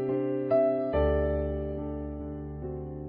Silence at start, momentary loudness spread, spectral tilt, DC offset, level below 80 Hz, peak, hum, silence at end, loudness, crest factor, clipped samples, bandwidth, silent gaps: 0 s; 12 LU; -11.5 dB/octave; under 0.1%; -38 dBFS; -14 dBFS; none; 0 s; -30 LUFS; 14 dB; under 0.1%; 5 kHz; none